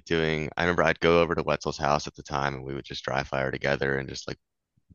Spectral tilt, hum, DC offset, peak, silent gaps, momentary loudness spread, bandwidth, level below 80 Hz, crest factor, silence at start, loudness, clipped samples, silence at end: -5 dB/octave; none; under 0.1%; -4 dBFS; none; 13 LU; 7.6 kHz; -48 dBFS; 22 dB; 0.05 s; -27 LUFS; under 0.1%; 0.6 s